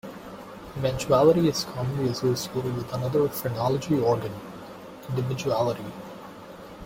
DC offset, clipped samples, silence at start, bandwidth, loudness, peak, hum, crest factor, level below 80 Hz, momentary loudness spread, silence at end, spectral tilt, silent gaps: under 0.1%; under 0.1%; 0.05 s; 16.5 kHz; -25 LUFS; -6 dBFS; none; 20 dB; -54 dBFS; 21 LU; 0 s; -6 dB/octave; none